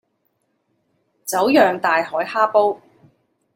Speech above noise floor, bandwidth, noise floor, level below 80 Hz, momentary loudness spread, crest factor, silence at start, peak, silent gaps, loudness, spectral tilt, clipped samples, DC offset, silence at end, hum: 52 dB; 16.5 kHz; -69 dBFS; -70 dBFS; 12 LU; 18 dB; 1.25 s; -2 dBFS; none; -18 LUFS; -3.5 dB/octave; under 0.1%; under 0.1%; 0.8 s; none